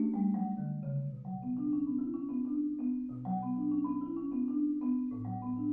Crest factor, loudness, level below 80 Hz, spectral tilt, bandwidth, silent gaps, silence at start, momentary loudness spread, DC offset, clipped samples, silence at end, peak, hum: 12 dB; -35 LUFS; -66 dBFS; -13.5 dB/octave; 2.6 kHz; none; 0 s; 5 LU; under 0.1%; under 0.1%; 0 s; -22 dBFS; none